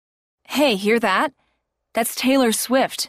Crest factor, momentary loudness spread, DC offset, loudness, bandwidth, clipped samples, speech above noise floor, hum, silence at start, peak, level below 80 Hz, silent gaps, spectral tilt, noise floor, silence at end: 14 dB; 9 LU; under 0.1%; -19 LUFS; 15.5 kHz; under 0.1%; 53 dB; none; 0.5 s; -6 dBFS; -64 dBFS; none; -3 dB/octave; -72 dBFS; 0 s